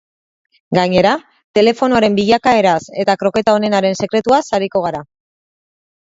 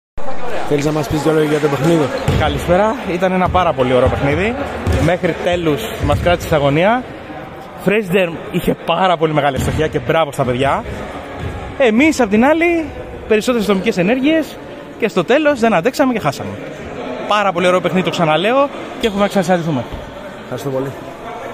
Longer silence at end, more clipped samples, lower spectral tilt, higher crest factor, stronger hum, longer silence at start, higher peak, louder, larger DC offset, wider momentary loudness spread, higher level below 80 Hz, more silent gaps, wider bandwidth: first, 1 s vs 0 s; neither; about the same, -5.5 dB/octave vs -6 dB/octave; about the same, 16 dB vs 14 dB; neither; first, 0.7 s vs 0.15 s; about the same, 0 dBFS vs -2 dBFS; about the same, -14 LUFS vs -15 LUFS; neither; second, 7 LU vs 14 LU; second, -50 dBFS vs -34 dBFS; first, 1.44-1.54 s vs none; second, 8 kHz vs 16 kHz